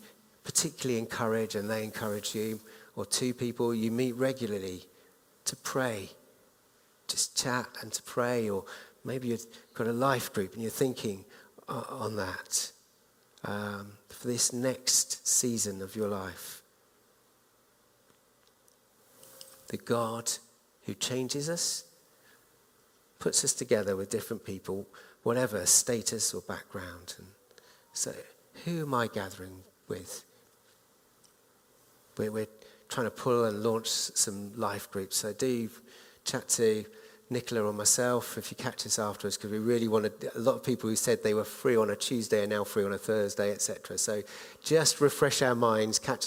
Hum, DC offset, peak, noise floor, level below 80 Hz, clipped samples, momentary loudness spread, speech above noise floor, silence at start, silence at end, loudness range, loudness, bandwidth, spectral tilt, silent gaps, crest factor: none; under 0.1%; -10 dBFS; -66 dBFS; -72 dBFS; under 0.1%; 16 LU; 35 dB; 0 s; 0 s; 9 LU; -31 LUFS; 17.5 kHz; -3 dB/octave; none; 24 dB